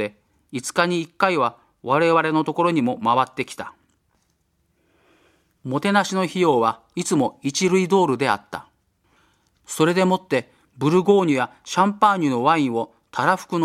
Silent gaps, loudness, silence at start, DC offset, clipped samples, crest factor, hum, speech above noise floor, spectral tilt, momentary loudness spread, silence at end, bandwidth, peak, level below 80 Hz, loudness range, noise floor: none; -20 LUFS; 0 s; under 0.1%; under 0.1%; 20 dB; none; 48 dB; -5 dB/octave; 12 LU; 0 s; 15 kHz; -2 dBFS; -68 dBFS; 6 LU; -68 dBFS